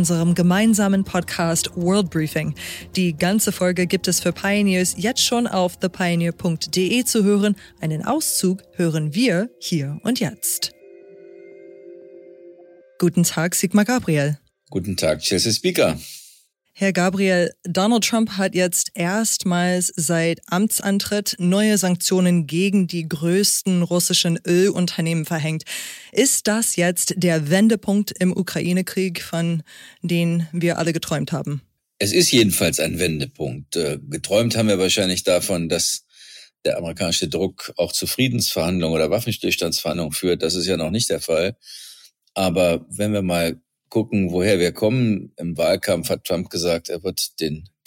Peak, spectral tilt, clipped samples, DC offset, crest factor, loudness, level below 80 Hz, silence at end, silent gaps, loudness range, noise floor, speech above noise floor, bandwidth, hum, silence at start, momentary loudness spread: -2 dBFS; -4 dB/octave; under 0.1%; under 0.1%; 18 dB; -20 LUFS; -52 dBFS; 0.2 s; none; 3 LU; -54 dBFS; 34 dB; 17 kHz; none; 0 s; 8 LU